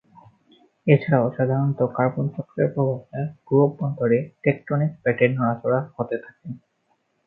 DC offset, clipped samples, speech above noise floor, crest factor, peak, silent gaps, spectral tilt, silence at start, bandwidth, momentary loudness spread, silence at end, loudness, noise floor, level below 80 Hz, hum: under 0.1%; under 0.1%; 47 dB; 22 dB; -2 dBFS; none; -12 dB/octave; 0.85 s; 4.3 kHz; 11 LU; 0.7 s; -23 LUFS; -69 dBFS; -64 dBFS; none